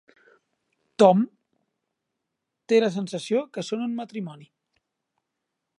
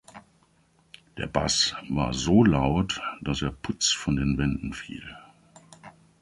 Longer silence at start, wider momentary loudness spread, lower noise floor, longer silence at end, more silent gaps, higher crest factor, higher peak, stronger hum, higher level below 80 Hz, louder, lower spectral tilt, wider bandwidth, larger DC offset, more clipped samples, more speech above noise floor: first, 1 s vs 0.15 s; about the same, 17 LU vs 17 LU; first, -82 dBFS vs -64 dBFS; first, 1.35 s vs 0.3 s; neither; about the same, 24 dB vs 20 dB; about the same, -4 dBFS vs -6 dBFS; neither; second, -78 dBFS vs -42 dBFS; about the same, -24 LUFS vs -25 LUFS; first, -6 dB/octave vs -4.5 dB/octave; about the same, 11 kHz vs 11.5 kHz; neither; neither; first, 60 dB vs 38 dB